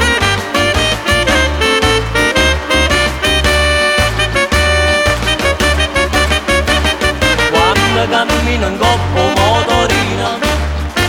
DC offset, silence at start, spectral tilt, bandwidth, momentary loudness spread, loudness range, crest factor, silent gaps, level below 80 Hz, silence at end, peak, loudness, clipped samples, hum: under 0.1%; 0 s; -3.5 dB/octave; 18 kHz; 3 LU; 1 LU; 12 dB; none; -20 dBFS; 0 s; 0 dBFS; -12 LUFS; under 0.1%; none